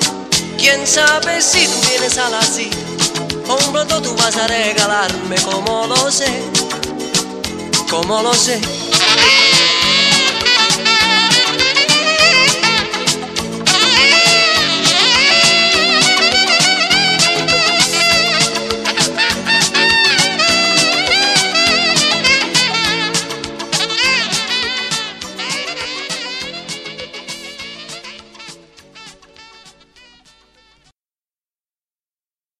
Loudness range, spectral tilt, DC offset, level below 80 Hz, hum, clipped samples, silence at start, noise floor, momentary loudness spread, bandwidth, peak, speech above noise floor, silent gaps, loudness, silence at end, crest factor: 12 LU; -1 dB/octave; under 0.1%; -46 dBFS; none; under 0.1%; 0 s; under -90 dBFS; 13 LU; 16 kHz; 0 dBFS; over 76 dB; none; -11 LUFS; 3.15 s; 14 dB